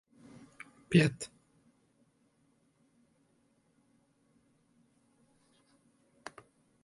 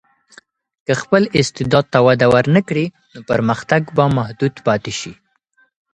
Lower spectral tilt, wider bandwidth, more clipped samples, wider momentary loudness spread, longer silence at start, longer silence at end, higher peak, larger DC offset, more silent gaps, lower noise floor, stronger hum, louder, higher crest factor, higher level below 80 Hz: about the same, -6 dB/octave vs -6 dB/octave; about the same, 11.5 kHz vs 10.5 kHz; neither; first, 25 LU vs 11 LU; about the same, 0.9 s vs 0.9 s; first, 5.6 s vs 0.8 s; second, -12 dBFS vs 0 dBFS; neither; neither; first, -72 dBFS vs -60 dBFS; neither; second, -30 LUFS vs -16 LUFS; first, 28 dB vs 16 dB; second, -72 dBFS vs -50 dBFS